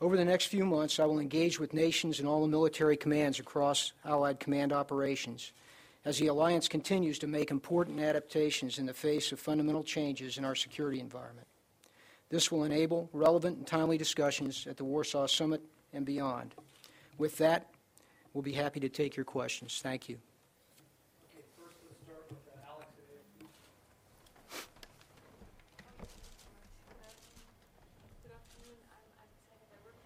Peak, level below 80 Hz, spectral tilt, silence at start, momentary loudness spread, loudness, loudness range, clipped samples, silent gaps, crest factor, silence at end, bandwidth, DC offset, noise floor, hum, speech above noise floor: -14 dBFS; -68 dBFS; -4.5 dB/octave; 0 s; 18 LU; -33 LUFS; 23 LU; under 0.1%; none; 20 dB; 1.4 s; 16 kHz; under 0.1%; -67 dBFS; none; 35 dB